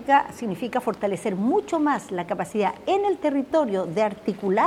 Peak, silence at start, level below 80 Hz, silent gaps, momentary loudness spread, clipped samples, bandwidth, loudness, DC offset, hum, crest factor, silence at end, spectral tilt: -6 dBFS; 0 s; -62 dBFS; none; 6 LU; under 0.1%; 15 kHz; -24 LUFS; under 0.1%; none; 18 dB; 0 s; -6 dB/octave